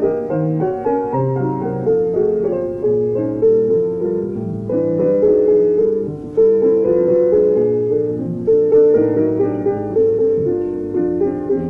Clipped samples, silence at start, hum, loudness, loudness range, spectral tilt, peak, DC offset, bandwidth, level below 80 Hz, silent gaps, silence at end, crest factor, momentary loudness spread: under 0.1%; 0 s; none; -16 LUFS; 3 LU; -11.5 dB/octave; -4 dBFS; under 0.1%; 2.8 kHz; -48 dBFS; none; 0 s; 12 dB; 7 LU